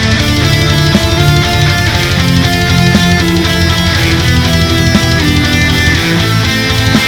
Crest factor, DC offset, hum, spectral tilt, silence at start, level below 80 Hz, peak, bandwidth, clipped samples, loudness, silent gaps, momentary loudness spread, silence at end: 8 dB; under 0.1%; none; -4.5 dB/octave; 0 s; -20 dBFS; 0 dBFS; 19.5 kHz; 0.8%; -9 LUFS; none; 2 LU; 0 s